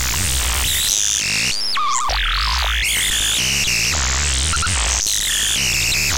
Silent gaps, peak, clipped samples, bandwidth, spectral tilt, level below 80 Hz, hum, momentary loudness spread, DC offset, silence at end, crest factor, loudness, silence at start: none; -2 dBFS; under 0.1%; 17.5 kHz; -0.5 dB/octave; -26 dBFS; none; 3 LU; under 0.1%; 0 s; 16 dB; -16 LUFS; 0 s